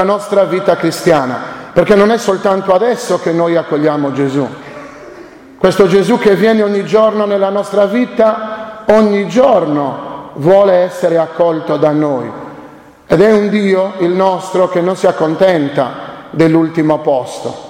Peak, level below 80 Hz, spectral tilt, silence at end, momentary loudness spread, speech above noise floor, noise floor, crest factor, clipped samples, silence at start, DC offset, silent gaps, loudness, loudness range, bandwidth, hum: 0 dBFS; -48 dBFS; -6.5 dB/octave; 0 s; 11 LU; 24 dB; -35 dBFS; 12 dB; under 0.1%; 0 s; under 0.1%; none; -12 LUFS; 2 LU; 16.5 kHz; none